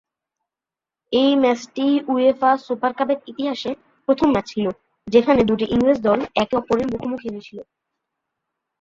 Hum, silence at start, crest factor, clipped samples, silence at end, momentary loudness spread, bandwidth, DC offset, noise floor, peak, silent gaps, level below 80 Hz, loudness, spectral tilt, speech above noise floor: none; 1.1 s; 20 dB; under 0.1%; 1.2 s; 13 LU; 7.4 kHz; under 0.1%; -89 dBFS; -2 dBFS; none; -52 dBFS; -20 LUFS; -6 dB/octave; 70 dB